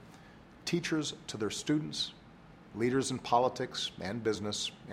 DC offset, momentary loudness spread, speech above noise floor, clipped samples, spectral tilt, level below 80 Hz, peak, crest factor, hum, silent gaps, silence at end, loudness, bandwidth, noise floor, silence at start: under 0.1%; 8 LU; 22 dB; under 0.1%; -4 dB/octave; -64 dBFS; -14 dBFS; 20 dB; none; none; 0 s; -34 LUFS; 15.5 kHz; -55 dBFS; 0 s